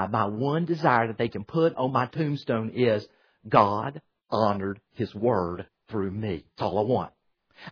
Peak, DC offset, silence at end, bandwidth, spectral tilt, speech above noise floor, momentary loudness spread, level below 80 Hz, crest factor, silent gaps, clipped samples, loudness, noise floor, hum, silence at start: -4 dBFS; under 0.1%; 0 s; 5.4 kHz; -8.5 dB/octave; 25 dB; 11 LU; -60 dBFS; 22 dB; none; under 0.1%; -27 LUFS; -51 dBFS; none; 0 s